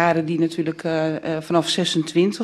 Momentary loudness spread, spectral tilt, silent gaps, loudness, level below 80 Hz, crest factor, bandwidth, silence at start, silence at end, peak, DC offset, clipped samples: 4 LU; -5 dB/octave; none; -21 LUFS; -64 dBFS; 18 dB; 12.5 kHz; 0 s; 0 s; -2 dBFS; under 0.1%; under 0.1%